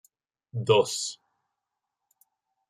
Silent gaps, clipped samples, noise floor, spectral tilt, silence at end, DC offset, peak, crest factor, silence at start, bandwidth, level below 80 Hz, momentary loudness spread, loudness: none; under 0.1%; -85 dBFS; -3.5 dB/octave; 1.55 s; under 0.1%; -8 dBFS; 22 dB; 0.55 s; 14 kHz; -76 dBFS; 17 LU; -26 LUFS